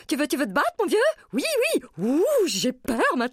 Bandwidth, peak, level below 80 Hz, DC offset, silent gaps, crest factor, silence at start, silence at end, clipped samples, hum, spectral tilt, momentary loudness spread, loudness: 16 kHz; -10 dBFS; -58 dBFS; under 0.1%; none; 14 dB; 0.1 s; 0 s; under 0.1%; none; -3.5 dB/octave; 4 LU; -23 LUFS